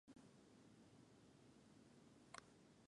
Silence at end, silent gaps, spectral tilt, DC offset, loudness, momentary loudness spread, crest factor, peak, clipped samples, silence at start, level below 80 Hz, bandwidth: 0 s; none; -4 dB/octave; under 0.1%; -67 LUFS; 7 LU; 32 dB; -36 dBFS; under 0.1%; 0.05 s; -88 dBFS; 11 kHz